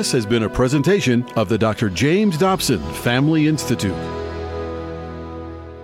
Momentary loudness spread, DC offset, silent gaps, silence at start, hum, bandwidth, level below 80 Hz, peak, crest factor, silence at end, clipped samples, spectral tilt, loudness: 14 LU; under 0.1%; none; 0 s; none; 16.5 kHz; -40 dBFS; -6 dBFS; 12 dB; 0 s; under 0.1%; -5.5 dB/octave; -19 LUFS